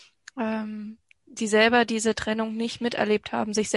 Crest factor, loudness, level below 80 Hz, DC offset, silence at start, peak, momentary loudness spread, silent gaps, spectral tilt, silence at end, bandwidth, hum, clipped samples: 20 dB; -25 LUFS; -58 dBFS; under 0.1%; 0.35 s; -6 dBFS; 18 LU; none; -3.5 dB/octave; 0 s; 11.5 kHz; none; under 0.1%